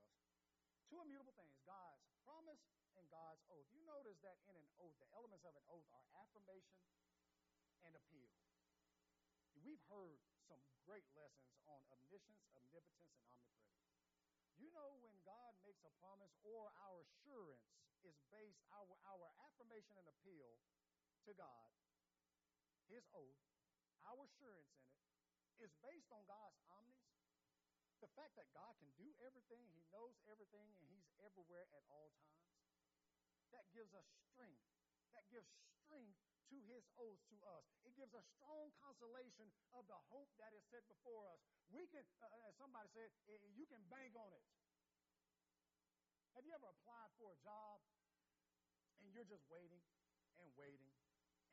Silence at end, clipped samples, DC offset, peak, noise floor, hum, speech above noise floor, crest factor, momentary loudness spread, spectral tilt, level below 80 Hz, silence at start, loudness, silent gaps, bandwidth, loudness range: 0.5 s; under 0.1%; under 0.1%; -48 dBFS; under -90 dBFS; none; over 24 dB; 18 dB; 7 LU; -4.5 dB/octave; under -90 dBFS; 0 s; -66 LUFS; none; 7.4 kHz; 5 LU